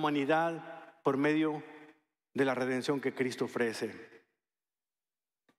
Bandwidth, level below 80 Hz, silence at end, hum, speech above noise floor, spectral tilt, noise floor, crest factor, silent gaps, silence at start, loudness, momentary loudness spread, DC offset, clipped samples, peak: 13.5 kHz; -86 dBFS; 1.4 s; none; over 58 dB; -5.5 dB/octave; under -90 dBFS; 18 dB; none; 0 s; -33 LUFS; 14 LU; under 0.1%; under 0.1%; -16 dBFS